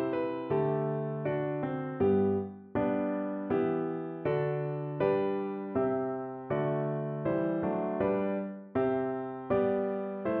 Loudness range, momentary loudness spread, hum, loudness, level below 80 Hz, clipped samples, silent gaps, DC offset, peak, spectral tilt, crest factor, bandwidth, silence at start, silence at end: 1 LU; 6 LU; none; -32 LUFS; -64 dBFS; under 0.1%; none; under 0.1%; -16 dBFS; -8 dB/octave; 14 dB; 4.3 kHz; 0 s; 0 s